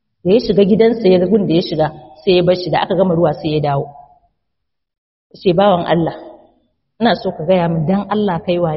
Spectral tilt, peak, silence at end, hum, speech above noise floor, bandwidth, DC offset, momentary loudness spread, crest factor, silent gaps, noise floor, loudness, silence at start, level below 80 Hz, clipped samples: -5.5 dB/octave; 0 dBFS; 0 s; none; 63 dB; 6 kHz; under 0.1%; 7 LU; 14 dB; 4.98-5.30 s; -77 dBFS; -15 LUFS; 0.25 s; -46 dBFS; under 0.1%